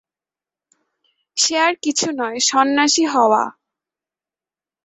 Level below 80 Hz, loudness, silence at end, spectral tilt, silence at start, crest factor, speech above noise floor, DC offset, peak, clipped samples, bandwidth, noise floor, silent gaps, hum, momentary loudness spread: -68 dBFS; -17 LUFS; 1.35 s; -1 dB/octave; 1.35 s; 18 dB; over 73 dB; under 0.1%; -2 dBFS; under 0.1%; 8.4 kHz; under -90 dBFS; none; none; 6 LU